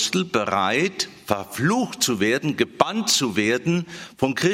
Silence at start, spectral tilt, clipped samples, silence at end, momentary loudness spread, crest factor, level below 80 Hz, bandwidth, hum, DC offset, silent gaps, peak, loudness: 0 s; -3.5 dB/octave; under 0.1%; 0 s; 7 LU; 22 dB; -60 dBFS; 16.5 kHz; none; under 0.1%; none; 0 dBFS; -22 LUFS